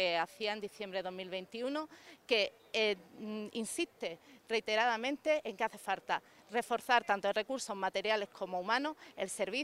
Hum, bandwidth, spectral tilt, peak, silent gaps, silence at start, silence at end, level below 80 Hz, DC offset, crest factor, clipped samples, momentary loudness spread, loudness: none; 16 kHz; -2.5 dB/octave; -14 dBFS; none; 0 s; 0 s; -80 dBFS; under 0.1%; 22 dB; under 0.1%; 11 LU; -36 LUFS